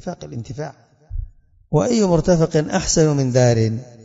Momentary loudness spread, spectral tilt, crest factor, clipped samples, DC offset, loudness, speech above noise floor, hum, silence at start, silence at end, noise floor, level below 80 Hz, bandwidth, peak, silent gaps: 18 LU; -5.5 dB/octave; 18 dB; under 0.1%; under 0.1%; -17 LUFS; 20 dB; none; 0.05 s; 0.15 s; -38 dBFS; -36 dBFS; 8 kHz; -2 dBFS; none